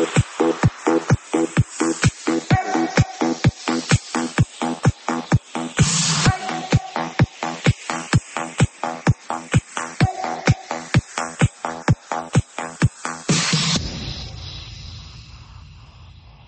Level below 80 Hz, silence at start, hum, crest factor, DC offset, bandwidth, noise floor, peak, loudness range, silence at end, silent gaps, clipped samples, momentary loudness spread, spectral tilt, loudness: -38 dBFS; 0 s; none; 18 dB; under 0.1%; 8.8 kHz; -43 dBFS; -2 dBFS; 3 LU; 0.35 s; none; under 0.1%; 11 LU; -4.5 dB/octave; -21 LUFS